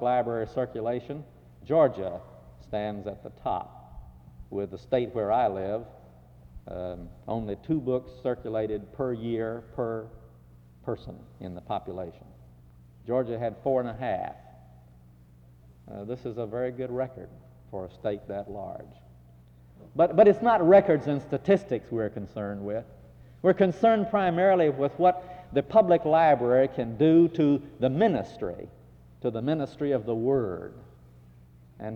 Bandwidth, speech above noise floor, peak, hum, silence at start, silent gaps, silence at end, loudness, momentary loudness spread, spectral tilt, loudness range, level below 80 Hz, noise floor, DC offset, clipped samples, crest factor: 7 kHz; 28 dB; -6 dBFS; none; 0 s; none; 0 s; -27 LUFS; 19 LU; -9 dB/octave; 13 LU; -56 dBFS; -54 dBFS; under 0.1%; under 0.1%; 20 dB